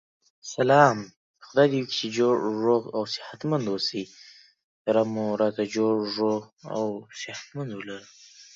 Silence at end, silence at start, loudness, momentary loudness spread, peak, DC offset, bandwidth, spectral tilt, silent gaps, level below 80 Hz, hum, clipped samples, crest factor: 0.15 s; 0.45 s; -25 LUFS; 15 LU; -4 dBFS; under 0.1%; 7.8 kHz; -5.5 dB/octave; 1.17-1.34 s, 4.64-4.85 s, 6.53-6.57 s; -74 dBFS; none; under 0.1%; 22 dB